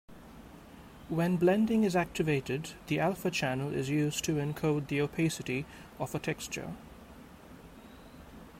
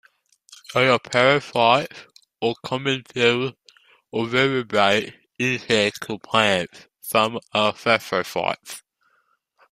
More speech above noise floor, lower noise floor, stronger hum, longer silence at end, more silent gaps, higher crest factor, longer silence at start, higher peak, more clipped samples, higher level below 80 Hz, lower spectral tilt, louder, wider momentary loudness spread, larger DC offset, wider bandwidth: second, 20 dB vs 46 dB; second, -51 dBFS vs -67 dBFS; neither; second, 0 s vs 0.9 s; neither; about the same, 18 dB vs 20 dB; second, 0.1 s vs 0.7 s; second, -16 dBFS vs -2 dBFS; neither; about the same, -58 dBFS vs -62 dBFS; first, -5.5 dB/octave vs -4 dB/octave; second, -32 LUFS vs -21 LUFS; first, 24 LU vs 13 LU; neither; about the same, 16 kHz vs 15.5 kHz